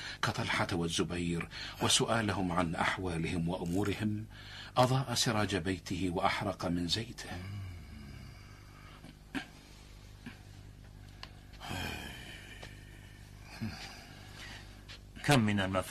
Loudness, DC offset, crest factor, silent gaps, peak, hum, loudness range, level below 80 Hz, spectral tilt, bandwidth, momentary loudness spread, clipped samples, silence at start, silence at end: -33 LUFS; under 0.1%; 22 dB; none; -14 dBFS; 50 Hz at -55 dBFS; 15 LU; -54 dBFS; -4.5 dB/octave; 13.5 kHz; 23 LU; under 0.1%; 0 s; 0 s